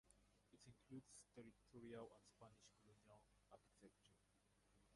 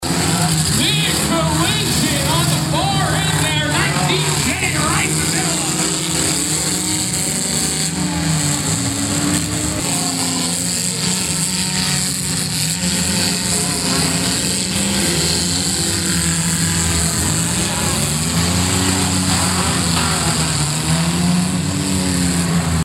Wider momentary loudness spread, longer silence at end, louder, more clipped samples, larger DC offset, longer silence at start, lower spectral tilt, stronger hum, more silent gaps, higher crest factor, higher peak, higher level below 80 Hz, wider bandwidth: first, 10 LU vs 2 LU; about the same, 0 s vs 0 s; second, -63 LUFS vs -16 LUFS; neither; neither; about the same, 0.05 s vs 0 s; first, -5 dB/octave vs -3 dB/octave; first, 50 Hz at -80 dBFS vs none; neither; first, 22 dB vs 12 dB; second, -46 dBFS vs -6 dBFS; second, -84 dBFS vs -36 dBFS; second, 11 kHz vs 17 kHz